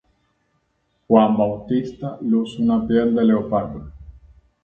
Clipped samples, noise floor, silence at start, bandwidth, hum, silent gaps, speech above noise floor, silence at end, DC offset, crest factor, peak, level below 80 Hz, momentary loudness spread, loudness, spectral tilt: under 0.1%; -68 dBFS; 1.1 s; 4.6 kHz; none; none; 50 dB; 0.5 s; under 0.1%; 20 dB; 0 dBFS; -48 dBFS; 14 LU; -19 LUFS; -9 dB/octave